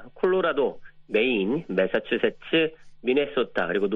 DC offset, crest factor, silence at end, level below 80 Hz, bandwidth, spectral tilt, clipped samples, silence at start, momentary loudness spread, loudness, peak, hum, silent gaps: under 0.1%; 16 dB; 0 s; -58 dBFS; 5.4 kHz; -7.5 dB/octave; under 0.1%; 0 s; 5 LU; -25 LUFS; -10 dBFS; none; none